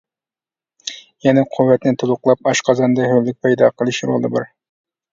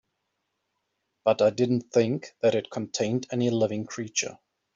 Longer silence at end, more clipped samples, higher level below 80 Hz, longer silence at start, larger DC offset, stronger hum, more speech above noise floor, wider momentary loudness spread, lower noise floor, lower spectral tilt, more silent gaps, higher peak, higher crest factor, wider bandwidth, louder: first, 0.65 s vs 0.4 s; neither; first, -60 dBFS vs -70 dBFS; second, 0.85 s vs 1.25 s; neither; neither; first, over 75 dB vs 54 dB; first, 15 LU vs 7 LU; first, under -90 dBFS vs -79 dBFS; about the same, -5.5 dB/octave vs -5 dB/octave; neither; first, 0 dBFS vs -8 dBFS; about the same, 16 dB vs 18 dB; about the same, 7.6 kHz vs 7.8 kHz; first, -16 LUFS vs -26 LUFS